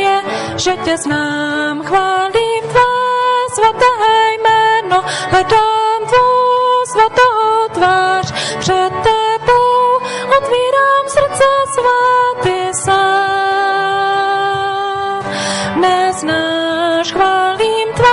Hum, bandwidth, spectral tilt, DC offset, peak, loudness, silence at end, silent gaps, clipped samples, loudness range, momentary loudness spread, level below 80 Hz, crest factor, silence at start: none; 11.5 kHz; -3.5 dB/octave; under 0.1%; -2 dBFS; -13 LUFS; 0 s; none; under 0.1%; 3 LU; 6 LU; -44 dBFS; 12 dB; 0 s